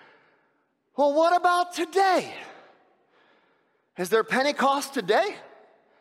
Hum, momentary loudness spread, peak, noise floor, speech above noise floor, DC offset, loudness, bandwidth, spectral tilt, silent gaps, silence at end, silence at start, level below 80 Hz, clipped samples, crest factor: none; 19 LU; -10 dBFS; -70 dBFS; 47 dB; under 0.1%; -24 LUFS; 16 kHz; -3.5 dB/octave; none; 0.6 s; 1 s; -82 dBFS; under 0.1%; 16 dB